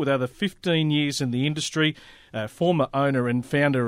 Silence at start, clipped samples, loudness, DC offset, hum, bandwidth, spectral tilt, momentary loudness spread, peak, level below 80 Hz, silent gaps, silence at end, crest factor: 0 s; under 0.1%; -24 LUFS; under 0.1%; none; 15 kHz; -5.5 dB/octave; 9 LU; -8 dBFS; -58 dBFS; none; 0 s; 14 dB